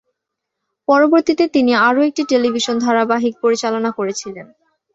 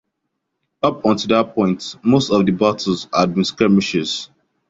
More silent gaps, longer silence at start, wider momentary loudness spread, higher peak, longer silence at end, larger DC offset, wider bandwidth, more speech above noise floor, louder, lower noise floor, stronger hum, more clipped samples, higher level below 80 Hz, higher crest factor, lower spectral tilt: neither; about the same, 0.9 s vs 0.85 s; first, 11 LU vs 6 LU; about the same, -2 dBFS vs -2 dBFS; about the same, 0.5 s vs 0.45 s; neither; about the same, 8 kHz vs 7.8 kHz; first, 64 dB vs 58 dB; first, -15 LUFS vs -18 LUFS; first, -79 dBFS vs -75 dBFS; neither; neither; second, -62 dBFS vs -52 dBFS; about the same, 16 dB vs 16 dB; second, -3.5 dB/octave vs -5.5 dB/octave